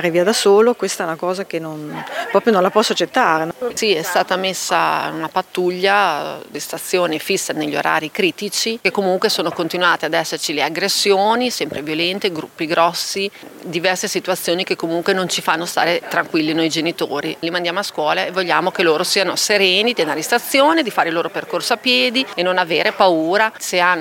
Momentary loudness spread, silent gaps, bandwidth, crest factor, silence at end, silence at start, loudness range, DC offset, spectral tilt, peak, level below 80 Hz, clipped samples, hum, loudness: 8 LU; none; 17 kHz; 16 dB; 0 s; 0 s; 3 LU; under 0.1%; -3 dB/octave; 0 dBFS; -68 dBFS; under 0.1%; none; -17 LUFS